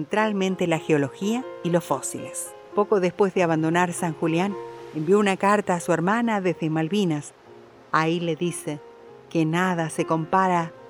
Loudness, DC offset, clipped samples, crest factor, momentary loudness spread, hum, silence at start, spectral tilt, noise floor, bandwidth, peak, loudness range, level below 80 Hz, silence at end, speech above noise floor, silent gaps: -24 LUFS; under 0.1%; under 0.1%; 18 dB; 10 LU; none; 0 s; -5.5 dB/octave; -48 dBFS; over 20 kHz; -6 dBFS; 4 LU; -70 dBFS; 0 s; 25 dB; none